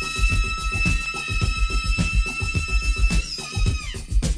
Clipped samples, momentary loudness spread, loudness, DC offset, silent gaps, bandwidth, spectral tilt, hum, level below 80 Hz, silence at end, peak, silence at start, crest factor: under 0.1%; 4 LU; -24 LUFS; under 0.1%; none; 11 kHz; -4 dB/octave; none; -24 dBFS; 0 s; -8 dBFS; 0 s; 14 dB